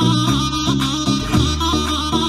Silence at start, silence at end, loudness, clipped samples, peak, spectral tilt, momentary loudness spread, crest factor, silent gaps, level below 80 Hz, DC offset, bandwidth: 0 s; 0 s; -17 LUFS; under 0.1%; -4 dBFS; -4.5 dB/octave; 2 LU; 12 dB; none; -28 dBFS; under 0.1%; 15.5 kHz